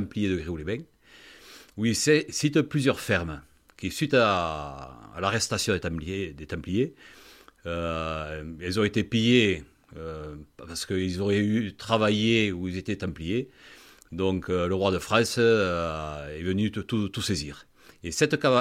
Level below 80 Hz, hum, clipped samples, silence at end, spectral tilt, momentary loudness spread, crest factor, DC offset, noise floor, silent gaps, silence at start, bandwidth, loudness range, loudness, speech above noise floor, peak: -50 dBFS; none; under 0.1%; 0 s; -5 dB/octave; 17 LU; 22 dB; under 0.1%; -52 dBFS; none; 0 s; 16 kHz; 4 LU; -26 LUFS; 26 dB; -6 dBFS